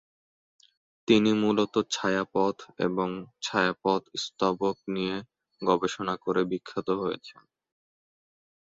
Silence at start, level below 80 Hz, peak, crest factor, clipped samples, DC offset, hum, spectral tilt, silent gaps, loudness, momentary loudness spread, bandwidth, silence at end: 1.1 s; -66 dBFS; -8 dBFS; 22 dB; under 0.1%; under 0.1%; none; -5 dB/octave; none; -28 LUFS; 9 LU; 7.8 kHz; 1.4 s